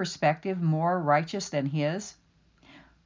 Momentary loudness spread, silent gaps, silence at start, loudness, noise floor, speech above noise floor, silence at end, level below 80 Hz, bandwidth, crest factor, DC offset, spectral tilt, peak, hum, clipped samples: 6 LU; none; 0 s; -28 LUFS; -60 dBFS; 33 dB; 0.25 s; -68 dBFS; 7.6 kHz; 18 dB; under 0.1%; -6 dB/octave; -12 dBFS; none; under 0.1%